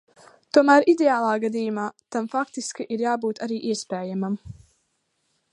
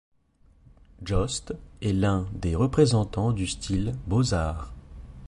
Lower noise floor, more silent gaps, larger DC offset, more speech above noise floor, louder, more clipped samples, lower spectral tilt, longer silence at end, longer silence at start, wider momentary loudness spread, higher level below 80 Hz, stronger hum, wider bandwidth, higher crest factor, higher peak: first, -72 dBFS vs -60 dBFS; neither; neither; first, 50 dB vs 35 dB; first, -23 LUFS vs -26 LUFS; neither; about the same, -5 dB/octave vs -6 dB/octave; first, 1 s vs 0 s; second, 0.55 s vs 1 s; second, 14 LU vs 18 LU; second, -62 dBFS vs -38 dBFS; neither; about the same, 11.5 kHz vs 11.5 kHz; about the same, 20 dB vs 20 dB; first, -2 dBFS vs -6 dBFS